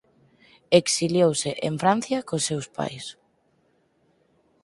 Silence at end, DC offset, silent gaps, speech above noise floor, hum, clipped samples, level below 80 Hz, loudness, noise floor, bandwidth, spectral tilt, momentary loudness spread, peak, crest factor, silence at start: 1.5 s; under 0.1%; none; 43 dB; none; under 0.1%; -64 dBFS; -23 LUFS; -66 dBFS; 11.5 kHz; -4 dB/octave; 12 LU; -2 dBFS; 24 dB; 0.7 s